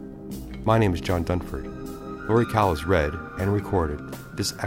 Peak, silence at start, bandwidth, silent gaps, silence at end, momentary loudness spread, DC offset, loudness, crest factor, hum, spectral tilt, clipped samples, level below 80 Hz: -4 dBFS; 0 s; 16.5 kHz; none; 0 s; 15 LU; under 0.1%; -25 LUFS; 20 dB; none; -6 dB/octave; under 0.1%; -38 dBFS